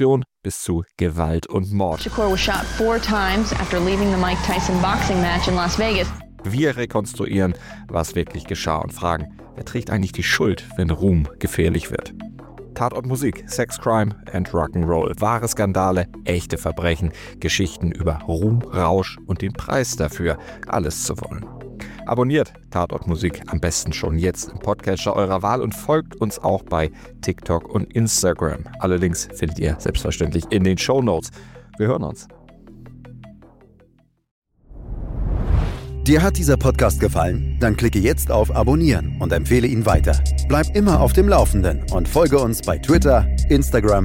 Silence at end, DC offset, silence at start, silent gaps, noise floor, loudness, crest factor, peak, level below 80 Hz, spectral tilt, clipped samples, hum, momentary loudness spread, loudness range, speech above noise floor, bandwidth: 0 s; under 0.1%; 0 s; 34.31-34.42 s; -57 dBFS; -20 LUFS; 18 dB; 0 dBFS; -28 dBFS; -5.5 dB/octave; under 0.1%; none; 10 LU; 6 LU; 38 dB; 17 kHz